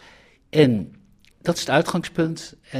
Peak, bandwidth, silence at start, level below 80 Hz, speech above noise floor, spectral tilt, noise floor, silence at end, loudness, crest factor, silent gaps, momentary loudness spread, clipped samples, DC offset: -4 dBFS; 15.5 kHz; 0.55 s; -56 dBFS; 31 dB; -5.5 dB/octave; -52 dBFS; 0 s; -22 LUFS; 20 dB; none; 12 LU; under 0.1%; under 0.1%